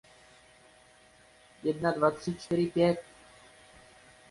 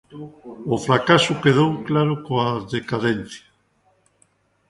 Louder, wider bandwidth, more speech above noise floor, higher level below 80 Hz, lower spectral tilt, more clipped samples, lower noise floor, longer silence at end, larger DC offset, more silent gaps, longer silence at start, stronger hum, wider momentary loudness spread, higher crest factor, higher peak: second, -30 LUFS vs -20 LUFS; about the same, 11.5 kHz vs 11.5 kHz; second, 31 dB vs 43 dB; second, -64 dBFS vs -56 dBFS; about the same, -6.5 dB/octave vs -5.5 dB/octave; neither; second, -59 dBFS vs -63 dBFS; about the same, 1.3 s vs 1.3 s; neither; neither; first, 1.65 s vs 0.1 s; neither; second, 10 LU vs 22 LU; about the same, 22 dB vs 22 dB; second, -12 dBFS vs 0 dBFS